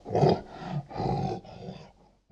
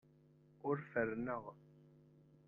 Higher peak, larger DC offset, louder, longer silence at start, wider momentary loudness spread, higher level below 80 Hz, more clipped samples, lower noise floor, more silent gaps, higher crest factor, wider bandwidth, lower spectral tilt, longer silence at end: first, -10 dBFS vs -24 dBFS; neither; first, -30 LUFS vs -42 LUFS; second, 0.05 s vs 0.65 s; first, 19 LU vs 16 LU; first, -52 dBFS vs -76 dBFS; neither; second, -55 dBFS vs -68 dBFS; neither; about the same, 20 dB vs 22 dB; first, 7.6 kHz vs 3.8 kHz; about the same, -8 dB/octave vs -8 dB/octave; second, 0.45 s vs 0.6 s